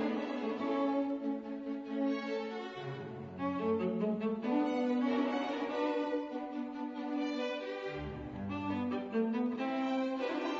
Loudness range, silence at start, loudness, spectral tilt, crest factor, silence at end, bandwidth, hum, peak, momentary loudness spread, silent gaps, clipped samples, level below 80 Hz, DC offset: 4 LU; 0 s; -36 LUFS; -5 dB/octave; 14 dB; 0 s; 7.4 kHz; none; -22 dBFS; 8 LU; none; under 0.1%; -64 dBFS; under 0.1%